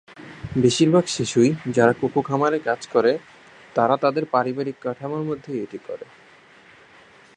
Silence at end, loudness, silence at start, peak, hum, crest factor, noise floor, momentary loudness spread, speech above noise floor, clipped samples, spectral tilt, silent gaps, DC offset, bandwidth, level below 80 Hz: 1.35 s; -21 LUFS; 0.1 s; -2 dBFS; none; 22 dB; -50 dBFS; 13 LU; 29 dB; under 0.1%; -5.5 dB/octave; none; under 0.1%; 10.5 kHz; -58 dBFS